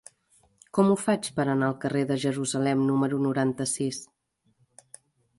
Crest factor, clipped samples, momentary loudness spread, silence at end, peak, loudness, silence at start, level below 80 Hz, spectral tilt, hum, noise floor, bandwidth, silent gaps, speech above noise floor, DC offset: 18 dB; under 0.1%; 6 LU; 1.35 s; -10 dBFS; -26 LUFS; 0.75 s; -68 dBFS; -5.5 dB/octave; none; -69 dBFS; 11.5 kHz; none; 44 dB; under 0.1%